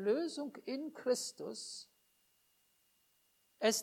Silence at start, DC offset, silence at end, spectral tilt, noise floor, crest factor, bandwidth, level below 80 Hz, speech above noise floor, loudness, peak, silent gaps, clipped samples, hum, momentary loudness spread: 0 s; under 0.1%; 0 s; -2.5 dB/octave; -75 dBFS; 22 dB; 19 kHz; under -90 dBFS; 36 dB; -39 LUFS; -18 dBFS; none; under 0.1%; none; 10 LU